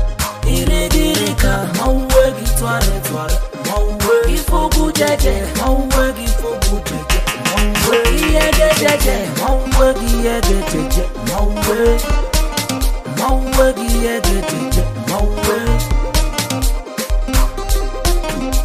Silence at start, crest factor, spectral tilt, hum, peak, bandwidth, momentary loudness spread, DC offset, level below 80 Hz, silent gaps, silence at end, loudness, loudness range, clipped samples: 0 s; 14 dB; -4 dB/octave; none; 0 dBFS; 16 kHz; 6 LU; under 0.1%; -18 dBFS; none; 0 s; -16 LUFS; 4 LU; under 0.1%